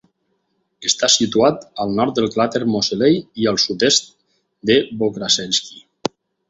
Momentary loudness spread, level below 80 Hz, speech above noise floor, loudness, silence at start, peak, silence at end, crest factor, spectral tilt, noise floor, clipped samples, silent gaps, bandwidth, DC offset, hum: 12 LU; -56 dBFS; 51 dB; -17 LUFS; 0.8 s; 0 dBFS; 0.7 s; 20 dB; -3 dB/octave; -69 dBFS; under 0.1%; none; 8.2 kHz; under 0.1%; none